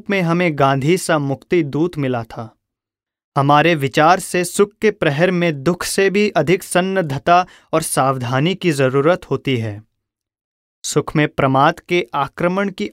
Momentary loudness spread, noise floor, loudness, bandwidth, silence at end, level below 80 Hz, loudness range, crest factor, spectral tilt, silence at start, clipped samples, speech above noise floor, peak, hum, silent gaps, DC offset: 8 LU; -88 dBFS; -17 LUFS; 16 kHz; 0 s; -52 dBFS; 3 LU; 16 dB; -5.5 dB/octave; 0.1 s; under 0.1%; 71 dB; 0 dBFS; none; 3.24-3.32 s, 10.44-10.82 s; under 0.1%